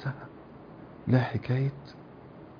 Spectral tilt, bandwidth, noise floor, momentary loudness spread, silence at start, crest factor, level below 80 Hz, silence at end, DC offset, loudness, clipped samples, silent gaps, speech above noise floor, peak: -9.5 dB/octave; 5.2 kHz; -48 dBFS; 22 LU; 0 s; 22 dB; -60 dBFS; 0 s; under 0.1%; -29 LUFS; under 0.1%; none; 20 dB; -10 dBFS